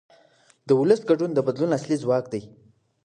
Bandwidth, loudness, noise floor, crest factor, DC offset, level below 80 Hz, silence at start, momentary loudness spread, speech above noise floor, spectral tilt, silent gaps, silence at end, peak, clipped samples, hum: 9.8 kHz; -23 LUFS; -59 dBFS; 18 dB; under 0.1%; -68 dBFS; 0.65 s; 7 LU; 37 dB; -7 dB/octave; none; 0.6 s; -6 dBFS; under 0.1%; none